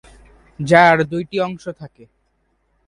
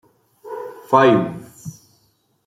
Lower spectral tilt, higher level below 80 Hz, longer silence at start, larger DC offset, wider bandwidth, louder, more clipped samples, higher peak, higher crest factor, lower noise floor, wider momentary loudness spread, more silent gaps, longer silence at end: about the same, -6 dB/octave vs -6.5 dB/octave; first, -52 dBFS vs -64 dBFS; first, 0.6 s vs 0.45 s; neither; second, 11 kHz vs 15.5 kHz; about the same, -15 LUFS vs -16 LUFS; neither; about the same, 0 dBFS vs -2 dBFS; about the same, 20 dB vs 18 dB; about the same, -65 dBFS vs -63 dBFS; second, 21 LU vs 24 LU; neither; first, 1 s vs 0.75 s